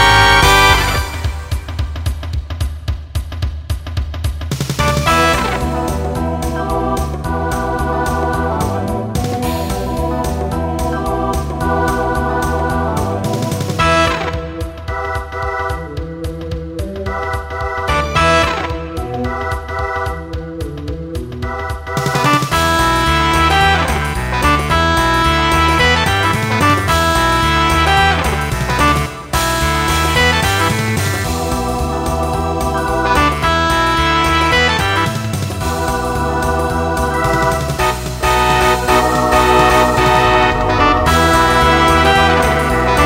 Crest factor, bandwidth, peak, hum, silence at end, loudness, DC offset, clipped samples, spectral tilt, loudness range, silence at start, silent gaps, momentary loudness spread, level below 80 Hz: 14 dB; 16.5 kHz; 0 dBFS; none; 0 s; -15 LUFS; under 0.1%; under 0.1%; -4.5 dB/octave; 7 LU; 0 s; none; 12 LU; -24 dBFS